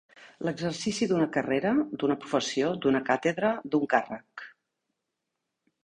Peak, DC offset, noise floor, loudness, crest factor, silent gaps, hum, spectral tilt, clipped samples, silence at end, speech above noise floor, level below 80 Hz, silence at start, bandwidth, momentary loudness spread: -8 dBFS; under 0.1%; -84 dBFS; -28 LUFS; 22 dB; none; none; -5 dB/octave; under 0.1%; 1.35 s; 56 dB; -66 dBFS; 0.2 s; 10.5 kHz; 12 LU